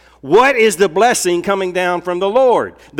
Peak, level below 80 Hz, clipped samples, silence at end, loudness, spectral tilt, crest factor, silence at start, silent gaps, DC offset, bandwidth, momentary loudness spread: -2 dBFS; -50 dBFS; under 0.1%; 0 s; -14 LUFS; -3.5 dB/octave; 12 dB; 0.25 s; none; under 0.1%; 17 kHz; 6 LU